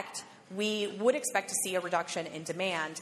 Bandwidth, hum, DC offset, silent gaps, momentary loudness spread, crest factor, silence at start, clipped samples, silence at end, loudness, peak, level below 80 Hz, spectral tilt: 13.5 kHz; none; under 0.1%; none; 10 LU; 20 dB; 0 s; under 0.1%; 0 s; -32 LUFS; -12 dBFS; -86 dBFS; -2.5 dB/octave